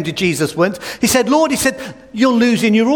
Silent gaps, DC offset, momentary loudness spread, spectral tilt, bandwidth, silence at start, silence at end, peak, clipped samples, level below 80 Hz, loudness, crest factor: none; 0.1%; 6 LU; -4 dB/octave; 18 kHz; 0 s; 0 s; -2 dBFS; under 0.1%; -48 dBFS; -15 LUFS; 14 dB